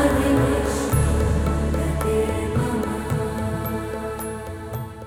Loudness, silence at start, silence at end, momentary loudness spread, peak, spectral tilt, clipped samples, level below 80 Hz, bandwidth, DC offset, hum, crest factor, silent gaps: -23 LUFS; 0 s; 0 s; 11 LU; -8 dBFS; -6.5 dB/octave; under 0.1%; -28 dBFS; 17 kHz; under 0.1%; none; 14 dB; none